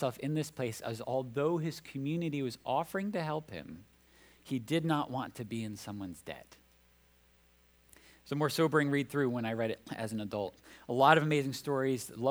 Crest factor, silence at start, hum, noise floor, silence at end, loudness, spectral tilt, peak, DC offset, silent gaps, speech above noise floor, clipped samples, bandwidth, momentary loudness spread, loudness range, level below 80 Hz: 26 dB; 0 s; 60 Hz at -65 dBFS; -66 dBFS; 0 s; -34 LUFS; -6 dB/octave; -8 dBFS; under 0.1%; none; 33 dB; under 0.1%; over 20 kHz; 14 LU; 8 LU; -70 dBFS